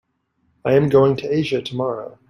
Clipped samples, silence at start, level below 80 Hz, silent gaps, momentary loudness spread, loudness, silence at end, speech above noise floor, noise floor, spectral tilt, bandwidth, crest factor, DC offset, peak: under 0.1%; 0.65 s; -54 dBFS; none; 10 LU; -19 LUFS; 0.2 s; 49 dB; -67 dBFS; -7.5 dB/octave; 10.5 kHz; 18 dB; under 0.1%; -2 dBFS